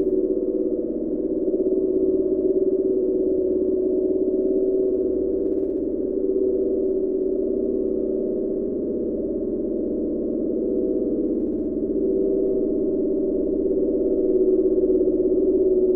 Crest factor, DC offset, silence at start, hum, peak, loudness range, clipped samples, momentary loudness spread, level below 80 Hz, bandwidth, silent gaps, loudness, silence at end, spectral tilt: 12 dB; under 0.1%; 0 s; none; -10 dBFS; 3 LU; under 0.1%; 5 LU; -44 dBFS; 1.4 kHz; none; -22 LUFS; 0 s; -14.5 dB/octave